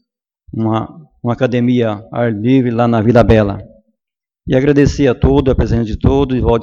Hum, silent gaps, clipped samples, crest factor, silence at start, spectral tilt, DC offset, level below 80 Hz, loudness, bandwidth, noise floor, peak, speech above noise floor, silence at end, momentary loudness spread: none; none; under 0.1%; 14 dB; 0.55 s; -8 dB/octave; under 0.1%; -26 dBFS; -13 LUFS; 7.4 kHz; -84 dBFS; 0 dBFS; 72 dB; 0 s; 10 LU